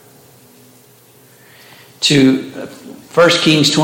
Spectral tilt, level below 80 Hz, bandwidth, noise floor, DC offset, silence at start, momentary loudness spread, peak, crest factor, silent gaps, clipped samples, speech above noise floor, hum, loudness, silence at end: -4 dB/octave; -58 dBFS; 17 kHz; -46 dBFS; under 0.1%; 2 s; 21 LU; 0 dBFS; 16 dB; none; under 0.1%; 35 dB; none; -12 LUFS; 0 s